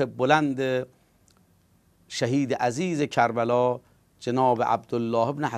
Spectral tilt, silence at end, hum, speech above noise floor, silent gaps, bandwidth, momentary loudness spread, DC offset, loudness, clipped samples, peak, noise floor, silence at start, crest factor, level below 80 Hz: -6 dB/octave; 0 s; none; 38 dB; none; 13.5 kHz; 8 LU; under 0.1%; -25 LUFS; under 0.1%; -4 dBFS; -62 dBFS; 0 s; 20 dB; -66 dBFS